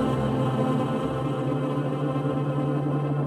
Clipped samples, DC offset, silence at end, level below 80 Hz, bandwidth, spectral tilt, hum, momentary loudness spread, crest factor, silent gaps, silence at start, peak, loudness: under 0.1%; under 0.1%; 0 s; -50 dBFS; 10.5 kHz; -8.5 dB/octave; none; 2 LU; 12 dB; none; 0 s; -12 dBFS; -26 LUFS